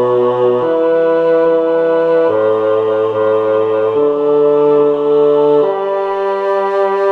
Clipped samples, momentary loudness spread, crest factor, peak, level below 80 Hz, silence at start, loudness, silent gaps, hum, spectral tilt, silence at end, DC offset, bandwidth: under 0.1%; 4 LU; 10 dB; -2 dBFS; -58 dBFS; 0 s; -13 LUFS; none; none; -8 dB/octave; 0 s; under 0.1%; 4.8 kHz